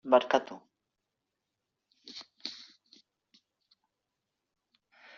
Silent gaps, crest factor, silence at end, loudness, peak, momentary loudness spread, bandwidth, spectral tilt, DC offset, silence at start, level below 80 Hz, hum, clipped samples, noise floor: none; 26 dB; 2.6 s; -30 LUFS; -10 dBFS; 25 LU; 7.2 kHz; -1 dB/octave; under 0.1%; 0.05 s; -84 dBFS; none; under 0.1%; -86 dBFS